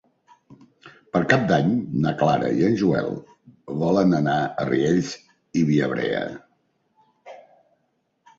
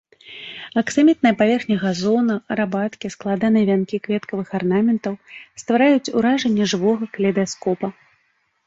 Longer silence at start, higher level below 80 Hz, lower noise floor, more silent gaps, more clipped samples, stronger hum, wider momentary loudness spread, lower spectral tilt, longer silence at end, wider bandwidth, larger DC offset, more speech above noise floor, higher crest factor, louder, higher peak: first, 0.5 s vs 0.25 s; about the same, -56 dBFS vs -60 dBFS; first, -71 dBFS vs -66 dBFS; neither; neither; neither; about the same, 13 LU vs 13 LU; first, -7 dB/octave vs -5.5 dB/octave; first, 1 s vs 0.75 s; about the same, 7.8 kHz vs 8 kHz; neither; about the same, 50 dB vs 47 dB; first, 22 dB vs 16 dB; second, -22 LUFS vs -19 LUFS; about the same, -2 dBFS vs -4 dBFS